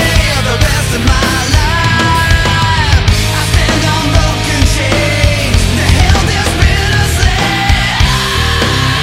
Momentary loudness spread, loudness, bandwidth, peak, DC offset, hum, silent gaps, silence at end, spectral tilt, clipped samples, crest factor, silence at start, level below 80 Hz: 2 LU; -10 LUFS; 16.5 kHz; 0 dBFS; under 0.1%; none; none; 0 s; -4 dB/octave; 0.2%; 10 dB; 0 s; -16 dBFS